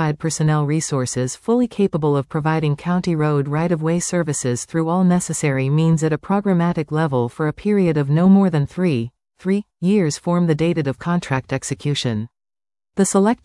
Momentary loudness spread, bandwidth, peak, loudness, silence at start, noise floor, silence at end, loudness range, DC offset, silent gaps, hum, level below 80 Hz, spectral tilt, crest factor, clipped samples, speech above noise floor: 6 LU; 12 kHz; -4 dBFS; -19 LUFS; 0 s; under -90 dBFS; 0.1 s; 3 LU; under 0.1%; none; none; -52 dBFS; -6 dB/octave; 16 dB; under 0.1%; over 72 dB